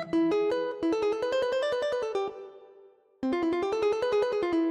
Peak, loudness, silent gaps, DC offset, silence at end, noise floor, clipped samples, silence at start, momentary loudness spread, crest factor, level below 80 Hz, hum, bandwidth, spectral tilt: -16 dBFS; -28 LUFS; none; under 0.1%; 0 s; -57 dBFS; under 0.1%; 0 s; 7 LU; 12 dB; -64 dBFS; none; 9.6 kHz; -5 dB/octave